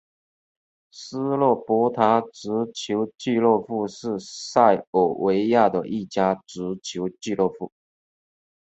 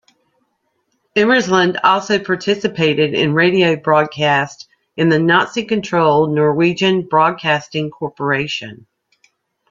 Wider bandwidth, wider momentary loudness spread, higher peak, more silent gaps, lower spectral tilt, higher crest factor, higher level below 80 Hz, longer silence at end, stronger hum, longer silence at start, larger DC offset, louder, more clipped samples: about the same, 8.2 kHz vs 7.6 kHz; first, 12 LU vs 9 LU; about the same, -2 dBFS vs 0 dBFS; first, 4.87-4.93 s vs none; about the same, -5.5 dB/octave vs -5.5 dB/octave; about the same, 20 dB vs 16 dB; second, -64 dBFS vs -58 dBFS; about the same, 0.95 s vs 0.95 s; neither; second, 0.95 s vs 1.15 s; neither; second, -23 LUFS vs -15 LUFS; neither